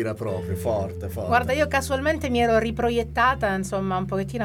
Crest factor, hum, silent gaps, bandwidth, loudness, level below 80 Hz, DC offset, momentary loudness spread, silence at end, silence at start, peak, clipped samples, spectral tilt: 16 dB; none; none; 17.5 kHz; -24 LUFS; -40 dBFS; under 0.1%; 7 LU; 0 s; 0 s; -8 dBFS; under 0.1%; -5.5 dB/octave